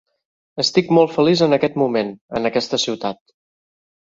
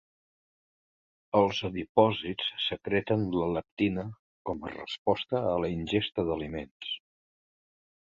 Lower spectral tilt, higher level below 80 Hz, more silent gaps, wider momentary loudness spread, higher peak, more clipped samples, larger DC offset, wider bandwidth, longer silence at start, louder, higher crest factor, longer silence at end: second, -5 dB/octave vs -6.5 dB/octave; about the same, -58 dBFS vs -56 dBFS; second, 2.21-2.28 s vs 1.89-1.95 s, 3.71-3.77 s, 4.19-4.45 s, 4.98-5.05 s, 6.71-6.80 s; about the same, 11 LU vs 12 LU; first, -2 dBFS vs -8 dBFS; neither; neither; about the same, 7.8 kHz vs 7.6 kHz; second, 0.55 s vs 1.35 s; first, -18 LUFS vs -30 LUFS; second, 18 dB vs 24 dB; second, 0.9 s vs 1.1 s